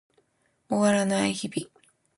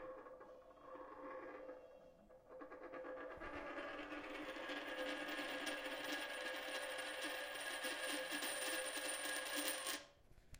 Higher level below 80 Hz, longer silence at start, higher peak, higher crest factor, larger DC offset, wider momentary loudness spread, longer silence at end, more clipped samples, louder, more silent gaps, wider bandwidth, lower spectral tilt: about the same, -68 dBFS vs -72 dBFS; first, 0.7 s vs 0 s; first, -10 dBFS vs -24 dBFS; second, 18 dB vs 24 dB; neither; second, 13 LU vs 16 LU; first, 0.5 s vs 0 s; neither; first, -26 LUFS vs -45 LUFS; neither; second, 11.5 kHz vs 16 kHz; first, -4.5 dB/octave vs -0.5 dB/octave